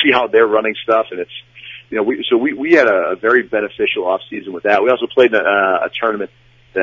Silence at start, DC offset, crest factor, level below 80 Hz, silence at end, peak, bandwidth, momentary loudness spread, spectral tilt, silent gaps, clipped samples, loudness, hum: 0 s; under 0.1%; 16 dB; -60 dBFS; 0 s; 0 dBFS; 7.2 kHz; 14 LU; -5.5 dB/octave; none; under 0.1%; -15 LUFS; none